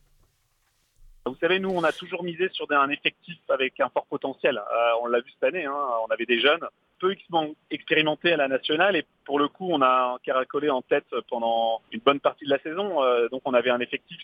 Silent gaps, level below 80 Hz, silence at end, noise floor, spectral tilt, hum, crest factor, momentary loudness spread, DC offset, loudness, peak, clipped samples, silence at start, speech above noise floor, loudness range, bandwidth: none; -66 dBFS; 0 s; -69 dBFS; -6 dB/octave; none; 22 dB; 8 LU; under 0.1%; -25 LUFS; -4 dBFS; under 0.1%; 1.25 s; 44 dB; 2 LU; 10.5 kHz